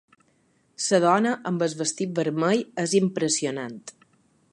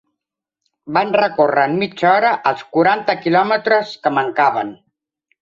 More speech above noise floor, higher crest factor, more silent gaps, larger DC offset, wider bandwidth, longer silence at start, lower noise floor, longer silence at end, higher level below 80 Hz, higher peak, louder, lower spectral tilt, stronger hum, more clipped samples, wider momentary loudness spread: second, 41 dB vs 66 dB; about the same, 20 dB vs 16 dB; neither; neither; first, 11.5 kHz vs 7.6 kHz; about the same, 0.8 s vs 0.85 s; second, -65 dBFS vs -82 dBFS; about the same, 0.65 s vs 0.7 s; second, -74 dBFS vs -64 dBFS; second, -6 dBFS vs -2 dBFS; second, -24 LUFS vs -16 LUFS; second, -4.5 dB/octave vs -6.5 dB/octave; neither; neither; first, 12 LU vs 5 LU